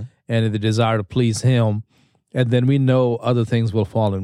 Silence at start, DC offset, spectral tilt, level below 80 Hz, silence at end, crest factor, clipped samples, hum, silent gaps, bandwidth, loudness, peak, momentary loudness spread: 0 s; under 0.1%; -7 dB/octave; -52 dBFS; 0 s; 14 dB; under 0.1%; none; none; 11.5 kHz; -19 LUFS; -4 dBFS; 6 LU